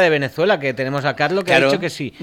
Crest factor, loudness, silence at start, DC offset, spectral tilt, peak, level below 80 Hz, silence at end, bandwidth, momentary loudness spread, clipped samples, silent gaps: 18 dB; -18 LUFS; 0 s; under 0.1%; -5 dB/octave; 0 dBFS; -60 dBFS; 0 s; 16.5 kHz; 7 LU; under 0.1%; none